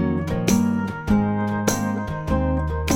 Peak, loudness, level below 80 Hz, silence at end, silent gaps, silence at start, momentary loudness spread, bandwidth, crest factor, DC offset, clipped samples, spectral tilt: -4 dBFS; -22 LUFS; -32 dBFS; 0 s; none; 0 s; 5 LU; 17 kHz; 16 dB; under 0.1%; under 0.1%; -6 dB/octave